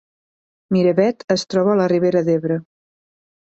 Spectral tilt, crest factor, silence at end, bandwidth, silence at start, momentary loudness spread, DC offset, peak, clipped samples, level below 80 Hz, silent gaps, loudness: -6.5 dB/octave; 16 dB; 0.8 s; 8.2 kHz; 0.7 s; 6 LU; under 0.1%; -2 dBFS; under 0.1%; -62 dBFS; 1.24-1.28 s; -18 LUFS